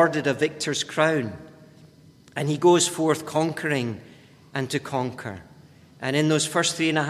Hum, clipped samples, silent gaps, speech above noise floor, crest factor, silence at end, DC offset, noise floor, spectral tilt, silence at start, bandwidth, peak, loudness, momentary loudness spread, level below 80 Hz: none; under 0.1%; none; 29 dB; 20 dB; 0 s; under 0.1%; -52 dBFS; -4 dB/octave; 0 s; 15 kHz; -4 dBFS; -24 LUFS; 16 LU; -62 dBFS